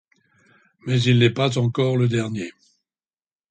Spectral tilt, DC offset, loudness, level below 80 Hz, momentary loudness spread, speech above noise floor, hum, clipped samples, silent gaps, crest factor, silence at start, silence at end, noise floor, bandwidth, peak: -6.5 dB/octave; under 0.1%; -20 LUFS; -58 dBFS; 15 LU; over 70 dB; none; under 0.1%; none; 18 dB; 0.85 s; 1 s; under -90 dBFS; 9 kHz; -4 dBFS